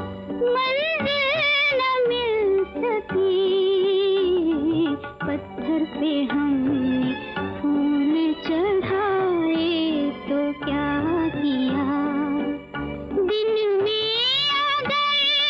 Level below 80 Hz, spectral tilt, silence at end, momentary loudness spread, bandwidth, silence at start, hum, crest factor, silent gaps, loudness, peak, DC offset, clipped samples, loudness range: -50 dBFS; -6 dB/octave; 0 s; 7 LU; 7.2 kHz; 0 s; none; 8 dB; none; -22 LUFS; -14 dBFS; under 0.1%; under 0.1%; 3 LU